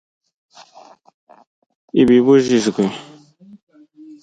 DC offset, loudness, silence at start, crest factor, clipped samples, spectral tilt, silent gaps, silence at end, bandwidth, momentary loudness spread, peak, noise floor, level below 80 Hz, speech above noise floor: under 0.1%; -15 LUFS; 1.95 s; 18 dB; under 0.1%; -6 dB/octave; 3.63-3.67 s; 0.1 s; 9.2 kHz; 11 LU; -2 dBFS; -46 dBFS; -54 dBFS; 33 dB